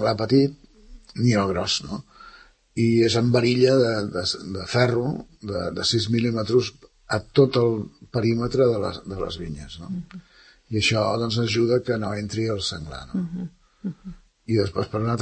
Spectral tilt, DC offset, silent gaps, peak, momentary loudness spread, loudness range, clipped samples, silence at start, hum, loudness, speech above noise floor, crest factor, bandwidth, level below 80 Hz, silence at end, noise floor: -5.5 dB/octave; under 0.1%; none; -4 dBFS; 16 LU; 4 LU; under 0.1%; 0 s; none; -23 LUFS; 28 dB; 20 dB; 8.8 kHz; -50 dBFS; 0 s; -50 dBFS